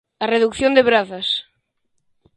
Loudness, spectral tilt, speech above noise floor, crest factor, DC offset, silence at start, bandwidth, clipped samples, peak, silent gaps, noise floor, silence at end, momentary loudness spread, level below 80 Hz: -17 LUFS; -4 dB/octave; 52 dB; 20 dB; under 0.1%; 0.2 s; 10.5 kHz; under 0.1%; 0 dBFS; none; -69 dBFS; 0.95 s; 8 LU; -52 dBFS